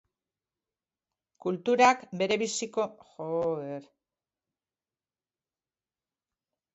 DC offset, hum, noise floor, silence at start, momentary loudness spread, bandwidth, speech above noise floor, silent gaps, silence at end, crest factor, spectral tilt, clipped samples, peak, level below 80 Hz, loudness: under 0.1%; none; under -90 dBFS; 1.45 s; 16 LU; 8.2 kHz; over 62 dB; none; 2.9 s; 24 dB; -3.5 dB/octave; under 0.1%; -8 dBFS; -74 dBFS; -28 LUFS